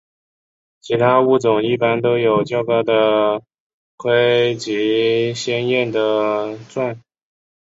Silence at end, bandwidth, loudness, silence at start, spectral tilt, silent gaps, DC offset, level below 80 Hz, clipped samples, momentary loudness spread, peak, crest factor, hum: 0.75 s; 7.8 kHz; -17 LUFS; 0.85 s; -5.5 dB/octave; 3.54-3.98 s; under 0.1%; -62 dBFS; under 0.1%; 10 LU; -2 dBFS; 16 dB; none